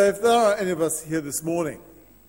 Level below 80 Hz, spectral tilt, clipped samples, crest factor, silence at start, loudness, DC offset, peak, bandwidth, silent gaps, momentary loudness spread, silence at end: -58 dBFS; -4 dB/octave; under 0.1%; 16 dB; 0 s; -23 LUFS; under 0.1%; -8 dBFS; 16.5 kHz; none; 10 LU; 0.45 s